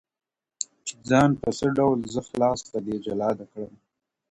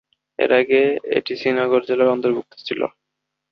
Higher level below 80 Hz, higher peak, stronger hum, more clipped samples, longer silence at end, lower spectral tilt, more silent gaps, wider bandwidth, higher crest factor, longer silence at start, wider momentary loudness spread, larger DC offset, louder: first, -54 dBFS vs -64 dBFS; second, -6 dBFS vs -2 dBFS; neither; neither; about the same, 0.65 s vs 0.65 s; about the same, -5.5 dB/octave vs -6.5 dB/octave; neither; first, 11 kHz vs 6.2 kHz; about the same, 20 dB vs 18 dB; first, 0.6 s vs 0.4 s; first, 15 LU vs 10 LU; neither; second, -25 LUFS vs -19 LUFS